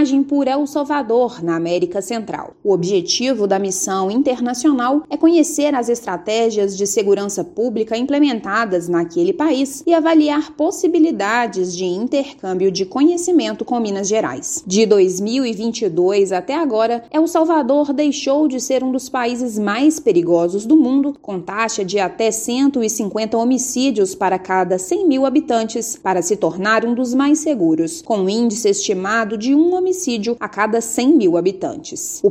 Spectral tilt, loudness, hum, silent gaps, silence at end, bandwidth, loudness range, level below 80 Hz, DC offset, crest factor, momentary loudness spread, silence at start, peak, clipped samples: -4 dB/octave; -17 LUFS; none; none; 0 s; 15.5 kHz; 2 LU; -60 dBFS; under 0.1%; 16 dB; 6 LU; 0 s; 0 dBFS; under 0.1%